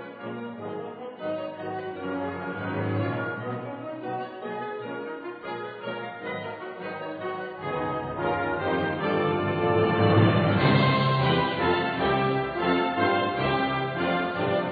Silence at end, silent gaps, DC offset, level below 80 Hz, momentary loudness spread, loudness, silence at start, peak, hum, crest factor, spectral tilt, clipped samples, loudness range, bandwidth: 0 s; none; under 0.1%; -56 dBFS; 14 LU; -27 LUFS; 0 s; -8 dBFS; none; 18 dB; -9.5 dB/octave; under 0.1%; 12 LU; 4.9 kHz